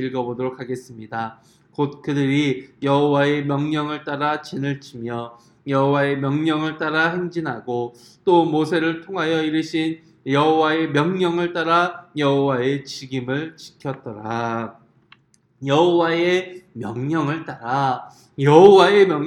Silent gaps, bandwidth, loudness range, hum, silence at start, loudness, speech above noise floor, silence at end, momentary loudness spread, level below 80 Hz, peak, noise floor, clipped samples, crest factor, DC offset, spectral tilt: none; 11 kHz; 3 LU; none; 0 s; -20 LUFS; 35 dB; 0 s; 14 LU; -64 dBFS; 0 dBFS; -55 dBFS; under 0.1%; 20 dB; under 0.1%; -6.5 dB/octave